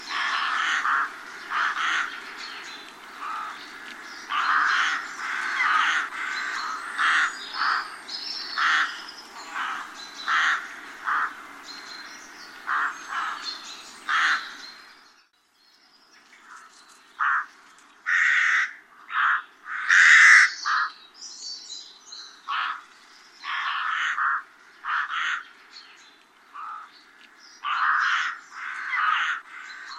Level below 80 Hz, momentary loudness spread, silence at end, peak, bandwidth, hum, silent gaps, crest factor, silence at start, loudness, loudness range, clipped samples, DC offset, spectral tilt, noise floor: -76 dBFS; 18 LU; 0 s; -2 dBFS; 15 kHz; none; none; 24 dB; 0 s; -23 LUFS; 12 LU; under 0.1%; under 0.1%; 2.5 dB/octave; -62 dBFS